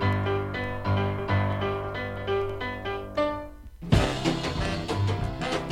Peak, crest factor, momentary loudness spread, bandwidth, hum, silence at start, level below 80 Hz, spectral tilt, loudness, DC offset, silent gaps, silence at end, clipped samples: -8 dBFS; 20 dB; 7 LU; 12.5 kHz; none; 0 s; -40 dBFS; -6 dB/octave; -28 LUFS; under 0.1%; none; 0 s; under 0.1%